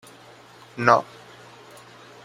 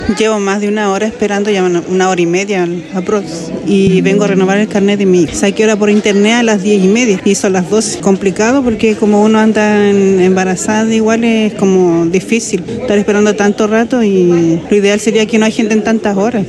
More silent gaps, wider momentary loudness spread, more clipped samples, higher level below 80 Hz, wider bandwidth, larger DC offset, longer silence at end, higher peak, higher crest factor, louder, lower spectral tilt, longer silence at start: neither; first, 26 LU vs 5 LU; neither; second, -68 dBFS vs -42 dBFS; first, 15.5 kHz vs 12 kHz; neither; first, 1.2 s vs 0 s; about the same, 0 dBFS vs 0 dBFS; first, 26 dB vs 10 dB; second, -20 LUFS vs -11 LUFS; about the same, -5.5 dB/octave vs -5 dB/octave; first, 0.75 s vs 0 s